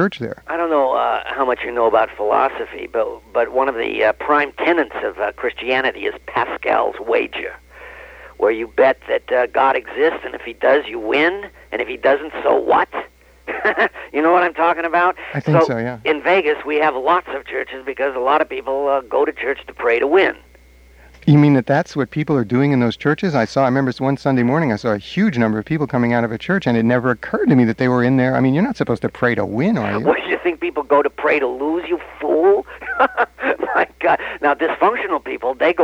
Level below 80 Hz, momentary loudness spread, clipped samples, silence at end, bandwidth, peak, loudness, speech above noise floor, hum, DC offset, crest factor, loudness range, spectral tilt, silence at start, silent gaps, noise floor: -50 dBFS; 8 LU; under 0.1%; 0 s; 9.6 kHz; -2 dBFS; -18 LUFS; 29 dB; none; under 0.1%; 16 dB; 2 LU; -7.5 dB/octave; 0 s; none; -46 dBFS